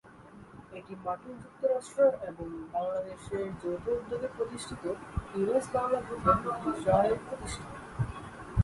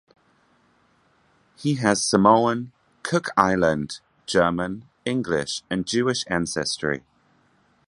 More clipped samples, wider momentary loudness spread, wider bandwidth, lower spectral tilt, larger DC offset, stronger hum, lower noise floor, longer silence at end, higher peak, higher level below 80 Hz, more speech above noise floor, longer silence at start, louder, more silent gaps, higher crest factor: neither; about the same, 16 LU vs 14 LU; about the same, 11.5 kHz vs 11.5 kHz; first, -6.5 dB/octave vs -4.5 dB/octave; neither; neither; second, -52 dBFS vs -62 dBFS; second, 0 s vs 0.9 s; second, -10 dBFS vs 0 dBFS; first, -48 dBFS vs -54 dBFS; second, 21 dB vs 40 dB; second, 0.05 s vs 1.6 s; second, -32 LUFS vs -23 LUFS; neither; about the same, 22 dB vs 24 dB